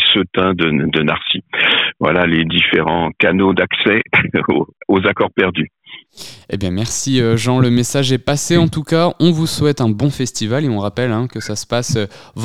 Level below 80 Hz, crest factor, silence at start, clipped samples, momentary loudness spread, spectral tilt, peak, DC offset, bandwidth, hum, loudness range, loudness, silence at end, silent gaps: -44 dBFS; 16 dB; 0 s; under 0.1%; 8 LU; -4.5 dB/octave; 0 dBFS; under 0.1%; 15.5 kHz; none; 4 LU; -15 LUFS; 0 s; none